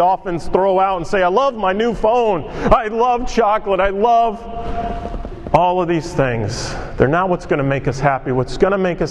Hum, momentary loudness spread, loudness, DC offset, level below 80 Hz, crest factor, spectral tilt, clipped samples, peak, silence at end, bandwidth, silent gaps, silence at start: none; 10 LU; -17 LUFS; under 0.1%; -32 dBFS; 16 dB; -6.5 dB/octave; under 0.1%; 0 dBFS; 0 s; 11.5 kHz; none; 0 s